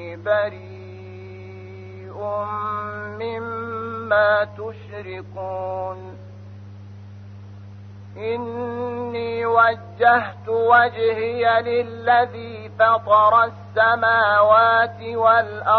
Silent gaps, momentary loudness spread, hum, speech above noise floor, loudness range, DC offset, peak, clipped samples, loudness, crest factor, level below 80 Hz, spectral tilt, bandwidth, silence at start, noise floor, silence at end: none; 25 LU; none; 19 dB; 15 LU; under 0.1%; -2 dBFS; under 0.1%; -19 LUFS; 18 dB; -60 dBFS; -7 dB/octave; 6 kHz; 0 s; -39 dBFS; 0 s